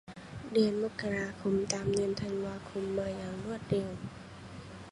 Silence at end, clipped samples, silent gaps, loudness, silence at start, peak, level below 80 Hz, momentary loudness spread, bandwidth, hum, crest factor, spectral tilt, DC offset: 0 s; under 0.1%; none; -34 LUFS; 0.05 s; -12 dBFS; -58 dBFS; 17 LU; 11.5 kHz; none; 22 dB; -5.5 dB/octave; under 0.1%